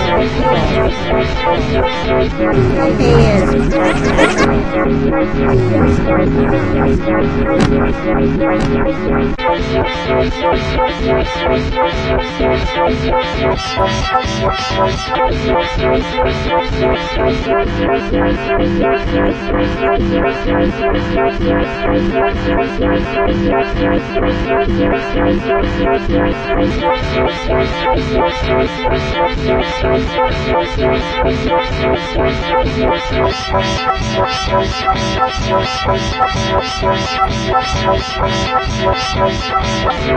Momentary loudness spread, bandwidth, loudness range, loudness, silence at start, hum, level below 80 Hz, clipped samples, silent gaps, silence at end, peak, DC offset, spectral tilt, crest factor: 3 LU; 9.8 kHz; 2 LU; -14 LUFS; 0 s; none; -24 dBFS; under 0.1%; none; 0 s; 0 dBFS; under 0.1%; -6 dB/octave; 14 dB